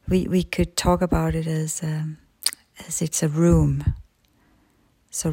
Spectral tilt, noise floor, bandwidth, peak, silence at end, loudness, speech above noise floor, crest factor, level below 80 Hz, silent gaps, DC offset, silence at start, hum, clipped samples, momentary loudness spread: -5.5 dB/octave; -62 dBFS; 16.5 kHz; -2 dBFS; 0 s; -23 LUFS; 40 dB; 22 dB; -36 dBFS; none; under 0.1%; 0.05 s; none; under 0.1%; 11 LU